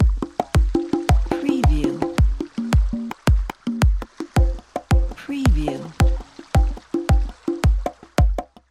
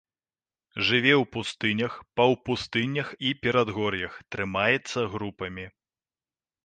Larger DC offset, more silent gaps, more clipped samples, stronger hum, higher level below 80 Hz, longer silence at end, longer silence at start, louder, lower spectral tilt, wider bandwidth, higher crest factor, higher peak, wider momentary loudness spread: neither; neither; neither; neither; first, -22 dBFS vs -58 dBFS; second, 0.25 s vs 0.95 s; second, 0 s vs 0.75 s; first, -22 LUFS vs -26 LUFS; first, -7 dB/octave vs -5 dB/octave; first, 13 kHz vs 9.6 kHz; second, 16 dB vs 22 dB; about the same, -4 dBFS vs -6 dBFS; second, 7 LU vs 13 LU